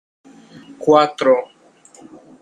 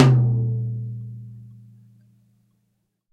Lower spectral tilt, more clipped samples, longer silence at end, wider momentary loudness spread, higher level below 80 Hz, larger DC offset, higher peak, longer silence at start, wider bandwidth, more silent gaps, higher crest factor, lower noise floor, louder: second, -5 dB/octave vs -8 dB/octave; neither; second, 0.95 s vs 1.6 s; second, 11 LU vs 25 LU; second, -64 dBFS vs -56 dBFS; neither; about the same, -2 dBFS vs 0 dBFS; first, 0.8 s vs 0 s; first, 10.5 kHz vs 7.2 kHz; neither; about the same, 18 dB vs 22 dB; second, -47 dBFS vs -72 dBFS; first, -16 LUFS vs -22 LUFS